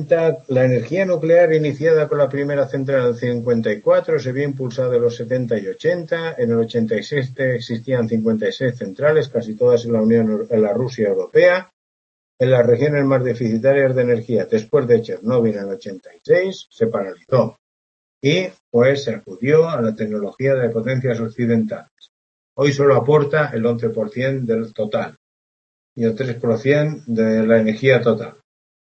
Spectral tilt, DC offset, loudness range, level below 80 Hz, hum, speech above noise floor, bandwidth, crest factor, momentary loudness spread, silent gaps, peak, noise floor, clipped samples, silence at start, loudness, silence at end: -7.5 dB/octave; under 0.1%; 4 LU; -62 dBFS; none; over 73 dB; 7.4 kHz; 16 dB; 8 LU; 11.73-12.38 s, 17.59-18.21 s, 18.60-18.72 s, 21.91-21.97 s, 22.09-22.56 s, 25.17-25.96 s; -2 dBFS; under -90 dBFS; under 0.1%; 0 s; -18 LUFS; 0.6 s